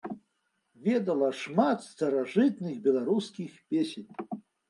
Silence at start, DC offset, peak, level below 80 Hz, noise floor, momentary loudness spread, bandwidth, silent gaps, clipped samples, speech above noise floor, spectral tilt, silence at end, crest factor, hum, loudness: 0.05 s; under 0.1%; -12 dBFS; -80 dBFS; -77 dBFS; 15 LU; 11.5 kHz; none; under 0.1%; 49 dB; -6.5 dB/octave; 0.3 s; 18 dB; none; -29 LUFS